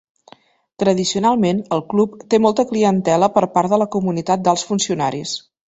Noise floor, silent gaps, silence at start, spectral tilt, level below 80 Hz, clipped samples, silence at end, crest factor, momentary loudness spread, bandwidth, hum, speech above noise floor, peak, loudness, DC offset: -50 dBFS; none; 0.8 s; -5 dB/octave; -56 dBFS; under 0.1%; 0.3 s; 16 dB; 5 LU; 8.2 kHz; none; 33 dB; -2 dBFS; -18 LUFS; under 0.1%